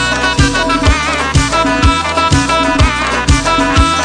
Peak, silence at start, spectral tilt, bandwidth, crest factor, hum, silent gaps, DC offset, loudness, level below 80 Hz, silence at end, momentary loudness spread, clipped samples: 0 dBFS; 0 s; -4 dB/octave; 10 kHz; 12 dB; none; none; under 0.1%; -11 LUFS; -18 dBFS; 0 s; 2 LU; under 0.1%